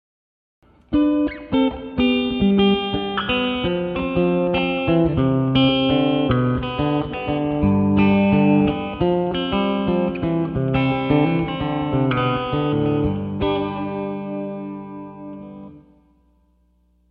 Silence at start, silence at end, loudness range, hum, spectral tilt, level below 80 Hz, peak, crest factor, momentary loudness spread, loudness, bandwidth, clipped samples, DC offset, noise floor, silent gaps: 0.9 s; 1.3 s; 6 LU; none; -9.5 dB/octave; -40 dBFS; -4 dBFS; 16 dB; 10 LU; -20 LUFS; 5.2 kHz; under 0.1%; under 0.1%; -60 dBFS; none